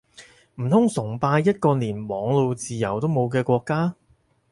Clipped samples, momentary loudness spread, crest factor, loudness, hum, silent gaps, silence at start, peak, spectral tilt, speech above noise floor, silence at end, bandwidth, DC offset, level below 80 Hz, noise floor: under 0.1%; 7 LU; 16 dB; -23 LUFS; none; none; 0.2 s; -6 dBFS; -7 dB/octave; 41 dB; 0.6 s; 11.5 kHz; under 0.1%; -58 dBFS; -62 dBFS